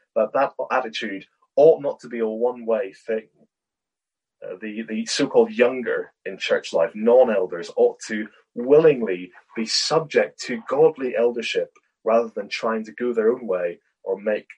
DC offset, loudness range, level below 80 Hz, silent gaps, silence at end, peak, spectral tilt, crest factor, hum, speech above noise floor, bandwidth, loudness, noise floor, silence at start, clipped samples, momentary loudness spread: under 0.1%; 5 LU; -74 dBFS; none; 0.15 s; -2 dBFS; -4 dB/octave; 20 dB; none; 67 dB; 10.5 kHz; -22 LUFS; -88 dBFS; 0.15 s; under 0.1%; 14 LU